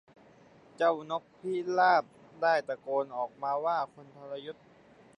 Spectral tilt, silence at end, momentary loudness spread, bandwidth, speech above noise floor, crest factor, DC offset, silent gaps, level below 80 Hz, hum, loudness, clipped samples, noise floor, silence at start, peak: -5.5 dB/octave; 0.65 s; 18 LU; 9.6 kHz; 28 dB; 20 dB; under 0.1%; none; -80 dBFS; none; -30 LUFS; under 0.1%; -58 dBFS; 0.8 s; -12 dBFS